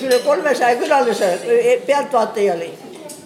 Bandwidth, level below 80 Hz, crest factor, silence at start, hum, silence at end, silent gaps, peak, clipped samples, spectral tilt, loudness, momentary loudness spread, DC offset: 16 kHz; -74 dBFS; 14 dB; 0 s; none; 0 s; none; -4 dBFS; under 0.1%; -3.5 dB/octave; -16 LUFS; 11 LU; under 0.1%